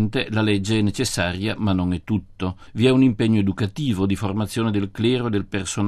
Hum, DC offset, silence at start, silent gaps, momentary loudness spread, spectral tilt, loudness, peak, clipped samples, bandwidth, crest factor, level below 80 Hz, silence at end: none; under 0.1%; 0 s; none; 7 LU; -6 dB/octave; -22 LUFS; -4 dBFS; under 0.1%; 13.5 kHz; 18 dB; -46 dBFS; 0 s